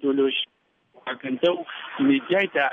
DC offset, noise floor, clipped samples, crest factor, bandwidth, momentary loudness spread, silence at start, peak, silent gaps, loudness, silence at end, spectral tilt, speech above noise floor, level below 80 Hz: under 0.1%; -61 dBFS; under 0.1%; 16 dB; 3.9 kHz; 13 LU; 0 s; -8 dBFS; none; -24 LUFS; 0 s; -6.5 dB/octave; 38 dB; -74 dBFS